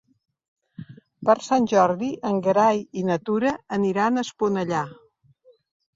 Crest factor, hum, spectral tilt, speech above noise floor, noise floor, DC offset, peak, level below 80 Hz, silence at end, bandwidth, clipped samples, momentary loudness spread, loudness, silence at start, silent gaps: 18 dB; none; -6 dB/octave; 36 dB; -58 dBFS; under 0.1%; -6 dBFS; -66 dBFS; 1.05 s; 7.8 kHz; under 0.1%; 9 LU; -22 LUFS; 0.8 s; none